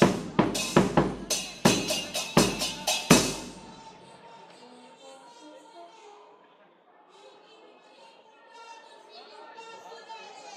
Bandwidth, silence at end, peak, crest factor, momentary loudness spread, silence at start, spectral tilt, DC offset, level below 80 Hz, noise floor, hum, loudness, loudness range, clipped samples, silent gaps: 16 kHz; 0 s; -4 dBFS; 26 dB; 27 LU; 0 s; -3.5 dB/octave; under 0.1%; -54 dBFS; -59 dBFS; none; -25 LUFS; 24 LU; under 0.1%; none